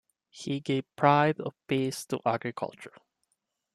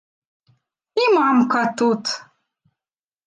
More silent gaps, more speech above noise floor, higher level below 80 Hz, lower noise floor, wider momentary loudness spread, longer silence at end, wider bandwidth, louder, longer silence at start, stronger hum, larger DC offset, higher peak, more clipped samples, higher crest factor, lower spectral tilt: neither; second, 51 dB vs over 72 dB; about the same, -72 dBFS vs -76 dBFS; second, -80 dBFS vs under -90 dBFS; first, 16 LU vs 11 LU; second, 0.85 s vs 1.05 s; first, 13.5 kHz vs 9.6 kHz; second, -29 LUFS vs -19 LUFS; second, 0.35 s vs 0.95 s; neither; neither; about the same, -8 dBFS vs -6 dBFS; neither; first, 22 dB vs 16 dB; first, -6 dB/octave vs -4.5 dB/octave